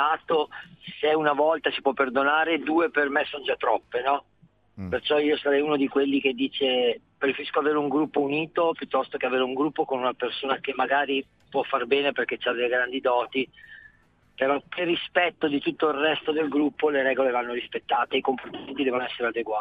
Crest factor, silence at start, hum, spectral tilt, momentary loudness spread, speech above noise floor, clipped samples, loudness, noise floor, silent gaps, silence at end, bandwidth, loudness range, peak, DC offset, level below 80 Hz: 18 dB; 0 s; none; -7 dB/octave; 6 LU; 36 dB; under 0.1%; -25 LUFS; -61 dBFS; none; 0 s; 4.9 kHz; 2 LU; -8 dBFS; under 0.1%; -68 dBFS